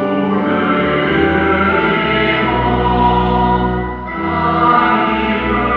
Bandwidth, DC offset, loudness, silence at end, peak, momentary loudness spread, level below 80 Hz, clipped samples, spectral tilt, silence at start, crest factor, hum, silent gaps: 5.6 kHz; under 0.1%; -14 LUFS; 0 s; 0 dBFS; 5 LU; -28 dBFS; under 0.1%; -8.5 dB/octave; 0 s; 14 dB; none; none